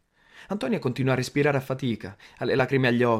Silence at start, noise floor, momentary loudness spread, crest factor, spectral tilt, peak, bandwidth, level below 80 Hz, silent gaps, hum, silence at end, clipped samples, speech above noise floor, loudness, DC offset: 0.35 s; -52 dBFS; 11 LU; 16 dB; -6.5 dB/octave; -8 dBFS; 15 kHz; -60 dBFS; none; none; 0 s; under 0.1%; 28 dB; -26 LUFS; under 0.1%